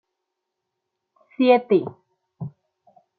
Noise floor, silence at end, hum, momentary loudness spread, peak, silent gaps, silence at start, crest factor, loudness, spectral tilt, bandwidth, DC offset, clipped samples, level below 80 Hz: -81 dBFS; 0.7 s; none; 20 LU; -4 dBFS; none; 1.4 s; 20 dB; -19 LUFS; -10 dB/octave; 4.7 kHz; under 0.1%; under 0.1%; -72 dBFS